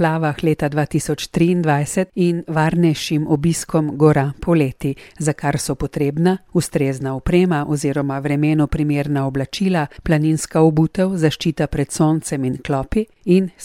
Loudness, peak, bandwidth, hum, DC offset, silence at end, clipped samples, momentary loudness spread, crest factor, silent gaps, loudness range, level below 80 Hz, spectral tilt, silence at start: -19 LUFS; -2 dBFS; 15.5 kHz; none; under 0.1%; 0 s; under 0.1%; 6 LU; 16 dB; none; 2 LU; -38 dBFS; -6.5 dB/octave; 0 s